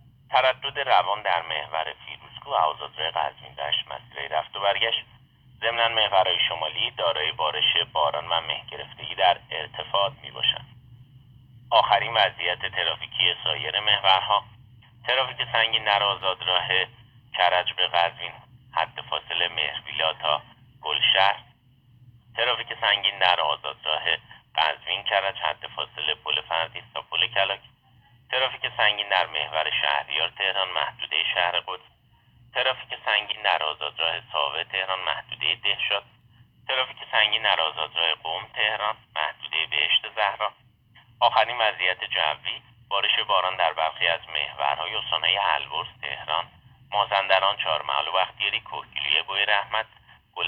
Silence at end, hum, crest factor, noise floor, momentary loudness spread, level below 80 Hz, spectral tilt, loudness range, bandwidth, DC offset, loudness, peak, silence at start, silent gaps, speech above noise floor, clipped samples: 0 s; none; 22 dB; -58 dBFS; 10 LU; -62 dBFS; -4 dB/octave; 3 LU; 6.2 kHz; under 0.1%; -24 LUFS; -4 dBFS; 0.3 s; none; 33 dB; under 0.1%